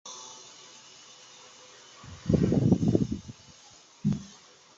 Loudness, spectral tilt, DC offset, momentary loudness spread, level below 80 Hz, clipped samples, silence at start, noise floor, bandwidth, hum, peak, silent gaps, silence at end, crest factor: -28 LUFS; -7 dB/octave; under 0.1%; 25 LU; -48 dBFS; under 0.1%; 0.05 s; -55 dBFS; 7.8 kHz; none; -6 dBFS; none; 0.5 s; 24 dB